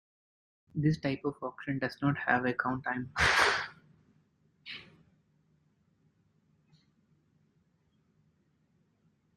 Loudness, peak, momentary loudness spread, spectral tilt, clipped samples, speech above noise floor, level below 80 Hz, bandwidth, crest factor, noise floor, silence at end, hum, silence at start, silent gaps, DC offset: -31 LUFS; -10 dBFS; 19 LU; -4.5 dB/octave; under 0.1%; 42 dB; -58 dBFS; 13 kHz; 26 dB; -72 dBFS; 4.55 s; none; 0.75 s; none; under 0.1%